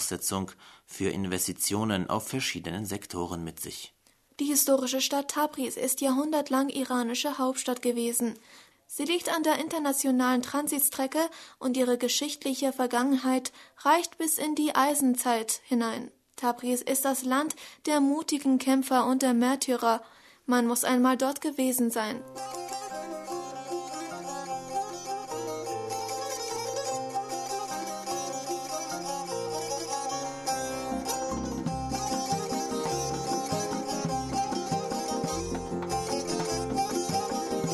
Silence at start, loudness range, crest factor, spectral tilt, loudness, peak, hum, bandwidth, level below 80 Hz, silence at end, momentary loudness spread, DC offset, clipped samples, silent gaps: 0 s; 7 LU; 18 dB; -3.5 dB/octave; -29 LUFS; -10 dBFS; none; 13.5 kHz; -56 dBFS; 0 s; 10 LU; under 0.1%; under 0.1%; none